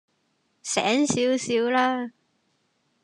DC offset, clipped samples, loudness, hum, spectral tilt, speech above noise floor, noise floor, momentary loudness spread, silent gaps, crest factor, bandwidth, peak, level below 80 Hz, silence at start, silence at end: under 0.1%; under 0.1%; -23 LUFS; none; -3 dB/octave; 48 dB; -71 dBFS; 11 LU; none; 20 dB; 11.5 kHz; -8 dBFS; -70 dBFS; 0.65 s; 0.95 s